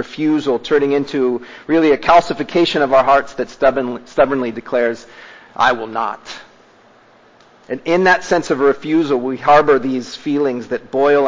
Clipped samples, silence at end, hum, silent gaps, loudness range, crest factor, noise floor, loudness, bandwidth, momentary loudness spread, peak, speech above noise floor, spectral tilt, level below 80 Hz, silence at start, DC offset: under 0.1%; 0 s; none; none; 6 LU; 16 dB; -48 dBFS; -16 LUFS; 7.6 kHz; 12 LU; 0 dBFS; 33 dB; -5.5 dB/octave; -52 dBFS; 0 s; under 0.1%